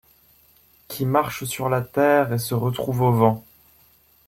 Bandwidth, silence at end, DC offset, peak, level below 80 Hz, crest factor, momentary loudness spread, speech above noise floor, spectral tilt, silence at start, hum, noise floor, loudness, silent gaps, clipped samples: 16.5 kHz; 0.85 s; under 0.1%; -2 dBFS; -56 dBFS; 20 dB; 9 LU; 37 dB; -6.5 dB/octave; 0.9 s; none; -57 dBFS; -22 LUFS; none; under 0.1%